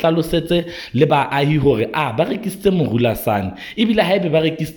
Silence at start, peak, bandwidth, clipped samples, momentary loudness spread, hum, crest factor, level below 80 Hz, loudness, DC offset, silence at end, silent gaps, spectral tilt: 0 s; -2 dBFS; 18.5 kHz; under 0.1%; 5 LU; none; 14 dB; -42 dBFS; -18 LUFS; under 0.1%; 0 s; none; -6.5 dB/octave